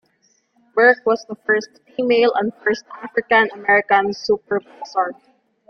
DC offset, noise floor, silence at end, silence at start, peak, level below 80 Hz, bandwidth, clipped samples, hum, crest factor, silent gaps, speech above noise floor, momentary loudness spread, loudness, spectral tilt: under 0.1%; -63 dBFS; 0.55 s; 0.75 s; -2 dBFS; -64 dBFS; 6.8 kHz; under 0.1%; none; 18 dB; none; 44 dB; 11 LU; -18 LUFS; -4.5 dB/octave